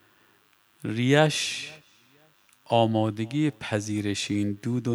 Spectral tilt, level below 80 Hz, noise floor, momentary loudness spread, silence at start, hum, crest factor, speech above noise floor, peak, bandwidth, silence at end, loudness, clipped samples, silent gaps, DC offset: -5 dB/octave; -68 dBFS; -63 dBFS; 12 LU; 0.8 s; none; 22 dB; 38 dB; -6 dBFS; over 20 kHz; 0 s; -26 LUFS; under 0.1%; none; under 0.1%